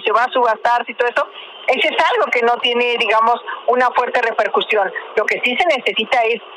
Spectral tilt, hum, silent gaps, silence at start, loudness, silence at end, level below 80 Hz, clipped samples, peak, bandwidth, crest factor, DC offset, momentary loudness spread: -2.5 dB/octave; none; none; 0 s; -16 LUFS; 0 s; -64 dBFS; under 0.1%; -4 dBFS; 11 kHz; 12 dB; under 0.1%; 5 LU